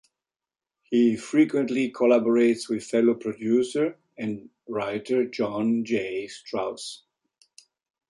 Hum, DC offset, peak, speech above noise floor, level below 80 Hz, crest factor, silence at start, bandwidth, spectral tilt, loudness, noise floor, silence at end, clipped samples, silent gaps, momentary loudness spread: none; under 0.1%; -10 dBFS; over 66 dB; -70 dBFS; 16 dB; 0.9 s; 11.5 kHz; -5.5 dB/octave; -25 LUFS; under -90 dBFS; 1.15 s; under 0.1%; none; 12 LU